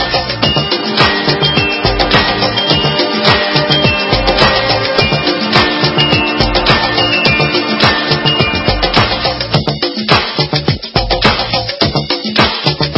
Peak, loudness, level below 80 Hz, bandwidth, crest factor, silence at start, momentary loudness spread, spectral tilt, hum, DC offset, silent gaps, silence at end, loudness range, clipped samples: 0 dBFS; -11 LUFS; -28 dBFS; 8 kHz; 12 dB; 0 s; 4 LU; -6 dB/octave; none; under 0.1%; none; 0 s; 2 LU; 0.3%